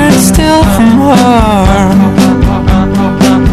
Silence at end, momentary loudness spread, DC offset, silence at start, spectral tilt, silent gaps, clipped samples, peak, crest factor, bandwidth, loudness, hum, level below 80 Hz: 0 s; 4 LU; 2%; 0 s; -6 dB/octave; none; 3%; 0 dBFS; 6 dB; 14.5 kHz; -7 LUFS; none; -16 dBFS